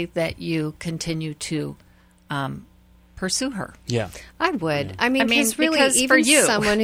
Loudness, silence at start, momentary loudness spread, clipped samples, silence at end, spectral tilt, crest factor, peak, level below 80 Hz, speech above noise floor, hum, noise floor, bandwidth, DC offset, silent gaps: -21 LUFS; 0 s; 16 LU; under 0.1%; 0 s; -3 dB/octave; 20 dB; -2 dBFS; -50 dBFS; 26 dB; none; -47 dBFS; 16 kHz; under 0.1%; none